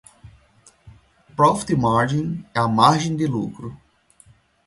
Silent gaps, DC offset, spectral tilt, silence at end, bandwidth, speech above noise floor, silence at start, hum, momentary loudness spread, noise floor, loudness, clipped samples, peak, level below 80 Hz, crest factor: none; under 0.1%; -6 dB/octave; 0.9 s; 11.5 kHz; 35 dB; 0.25 s; none; 16 LU; -55 dBFS; -20 LUFS; under 0.1%; 0 dBFS; -52 dBFS; 22 dB